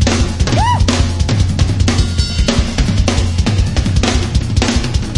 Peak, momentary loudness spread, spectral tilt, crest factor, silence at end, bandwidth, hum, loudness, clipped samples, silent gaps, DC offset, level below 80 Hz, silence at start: 0 dBFS; 2 LU; -5 dB/octave; 12 dB; 0 s; 11.5 kHz; none; -14 LUFS; under 0.1%; none; under 0.1%; -18 dBFS; 0 s